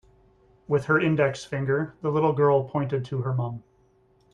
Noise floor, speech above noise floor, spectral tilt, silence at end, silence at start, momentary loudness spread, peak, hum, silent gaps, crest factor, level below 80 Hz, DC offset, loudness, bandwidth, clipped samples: -62 dBFS; 38 dB; -7.5 dB/octave; 0.75 s; 0.7 s; 8 LU; -8 dBFS; none; none; 16 dB; -60 dBFS; under 0.1%; -25 LUFS; 10 kHz; under 0.1%